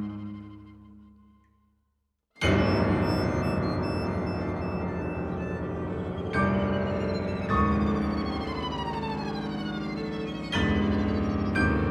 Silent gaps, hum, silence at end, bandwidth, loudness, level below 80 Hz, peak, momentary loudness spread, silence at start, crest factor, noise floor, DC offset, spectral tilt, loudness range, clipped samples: none; 50 Hz at -65 dBFS; 0 s; 11 kHz; -28 LUFS; -40 dBFS; -12 dBFS; 8 LU; 0 s; 18 dB; -76 dBFS; under 0.1%; -7 dB/octave; 2 LU; under 0.1%